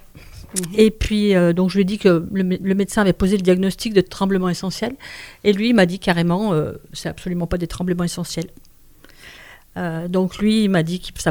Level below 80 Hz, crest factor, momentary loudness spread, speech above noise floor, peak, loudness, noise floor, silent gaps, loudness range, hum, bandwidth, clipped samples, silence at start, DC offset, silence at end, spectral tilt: -38 dBFS; 18 dB; 12 LU; 28 dB; 0 dBFS; -19 LUFS; -47 dBFS; none; 8 LU; none; over 20 kHz; under 0.1%; 0.15 s; under 0.1%; 0 s; -6 dB/octave